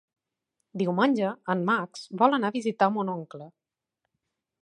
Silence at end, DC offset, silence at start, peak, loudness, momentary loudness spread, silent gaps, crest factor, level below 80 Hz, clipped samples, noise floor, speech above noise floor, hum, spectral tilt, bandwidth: 1.15 s; under 0.1%; 0.75 s; -6 dBFS; -26 LUFS; 14 LU; none; 22 dB; -82 dBFS; under 0.1%; -84 dBFS; 58 dB; none; -6.5 dB/octave; 11 kHz